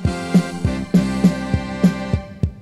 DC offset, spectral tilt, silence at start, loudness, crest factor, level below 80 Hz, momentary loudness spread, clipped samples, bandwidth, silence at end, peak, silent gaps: under 0.1%; -7 dB/octave; 0 s; -19 LUFS; 16 dB; -32 dBFS; 6 LU; under 0.1%; 12 kHz; 0 s; -2 dBFS; none